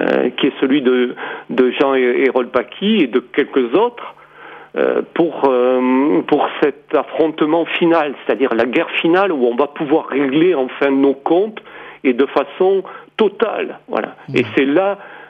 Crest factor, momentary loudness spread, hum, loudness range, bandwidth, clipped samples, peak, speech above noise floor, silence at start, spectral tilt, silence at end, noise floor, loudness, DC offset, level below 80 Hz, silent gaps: 14 dB; 7 LU; none; 2 LU; 5.6 kHz; under 0.1%; -2 dBFS; 23 dB; 0 s; -7.5 dB/octave; 0.05 s; -38 dBFS; -16 LUFS; under 0.1%; -64 dBFS; none